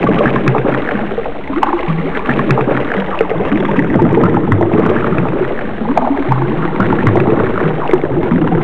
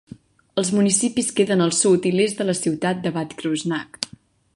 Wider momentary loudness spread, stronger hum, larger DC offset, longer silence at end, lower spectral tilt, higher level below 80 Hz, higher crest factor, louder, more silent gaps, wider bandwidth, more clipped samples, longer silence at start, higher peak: second, 6 LU vs 10 LU; neither; first, 8% vs under 0.1%; second, 0 s vs 0.5 s; first, -9.5 dB/octave vs -4 dB/octave; first, -32 dBFS vs -62 dBFS; second, 14 dB vs 20 dB; first, -14 LUFS vs -21 LUFS; neither; second, 7.2 kHz vs 11.5 kHz; first, 0.2% vs under 0.1%; second, 0 s vs 0.55 s; about the same, 0 dBFS vs -2 dBFS